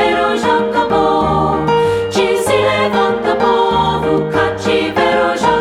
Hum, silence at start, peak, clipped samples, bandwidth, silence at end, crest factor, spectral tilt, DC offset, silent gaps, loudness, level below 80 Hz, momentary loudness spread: none; 0 s; -2 dBFS; under 0.1%; 14.5 kHz; 0 s; 12 dB; -5 dB/octave; under 0.1%; none; -14 LUFS; -38 dBFS; 2 LU